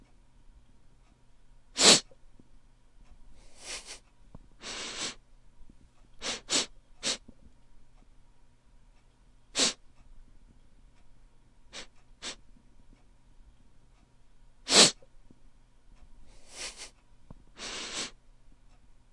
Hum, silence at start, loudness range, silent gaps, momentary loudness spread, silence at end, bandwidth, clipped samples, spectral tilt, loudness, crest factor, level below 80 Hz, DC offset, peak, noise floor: none; 1.75 s; 21 LU; none; 28 LU; 0.95 s; 11.5 kHz; under 0.1%; -0.5 dB/octave; -27 LUFS; 32 dB; -58 dBFS; under 0.1%; -2 dBFS; -59 dBFS